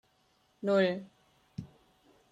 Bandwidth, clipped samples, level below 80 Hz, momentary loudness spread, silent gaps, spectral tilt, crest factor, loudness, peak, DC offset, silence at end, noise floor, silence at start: 9 kHz; under 0.1%; -72 dBFS; 20 LU; none; -7 dB/octave; 20 dB; -31 LUFS; -14 dBFS; under 0.1%; 0.65 s; -71 dBFS; 0.65 s